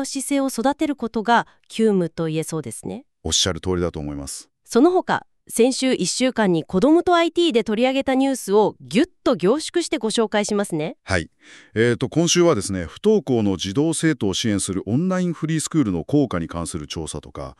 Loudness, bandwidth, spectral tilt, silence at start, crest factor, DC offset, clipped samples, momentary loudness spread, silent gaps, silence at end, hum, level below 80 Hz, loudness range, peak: -21 LUFS; 13.5 kHz; -4.5 dB/octave; 0 s; 16 dB; under 0.1%; under 0.1%; 12 LU; none; 0.05 s; none; -48 dBFS; 4 LU; -4 dBFS